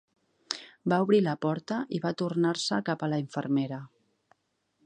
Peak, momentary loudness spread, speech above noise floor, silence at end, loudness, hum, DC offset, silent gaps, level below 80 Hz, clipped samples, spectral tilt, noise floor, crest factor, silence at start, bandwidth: -8 dBFS; 12 LU; 47 dB; 1 s; -29 LUFS; none; under 0.1%; none; -76 dBFS; under 0.1%; -6 dB/octave; -75 dBFS; 22 dB; 0.5 s; 9.8 kHz